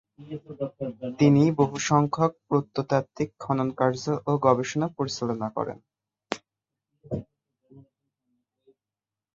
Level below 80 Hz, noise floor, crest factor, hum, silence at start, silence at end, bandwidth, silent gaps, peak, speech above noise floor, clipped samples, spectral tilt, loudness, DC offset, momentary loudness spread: -62 dBFS; under -90 dBFS; 22 dB; none; 0.2 s; 1.55 s; 7.6 kHz; none; -4 dBFS; over 65 dB; under 0.1%; -6.5 dB/octave; -26 LUFS; under 0.1%; 15 LU